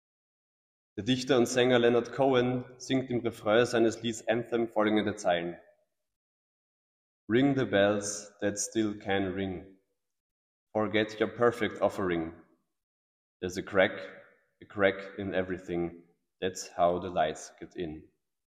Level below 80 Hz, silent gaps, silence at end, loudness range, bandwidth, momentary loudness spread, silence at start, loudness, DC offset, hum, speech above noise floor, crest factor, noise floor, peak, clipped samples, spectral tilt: -64 dBFS; 6.16-7.28 s, 10.20-10.67 s, 12.83-13.40 s; 0.55 s; 6 LU; 15 kHz; 14 LU; 0.95 s; -29 LUFS; under 0.1%; none; over 61 dB; 20 dB; under -90 dBFS; -10 dBFS; under 0.1%; -4.5 dB/octave